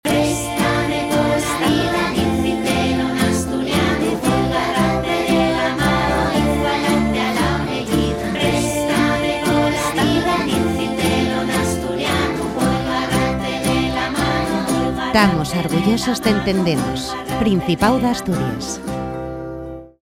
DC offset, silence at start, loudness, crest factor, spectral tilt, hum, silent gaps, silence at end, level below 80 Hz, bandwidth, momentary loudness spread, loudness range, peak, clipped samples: under 0.1%; 0.05 s; -18 LUFS; 18 dB; -5 dB/octave; none; none; 0.15 s; -34 dBFS; 16.5 kHz; 4 LU; 2 LU; 0 dBFS; under 0.1%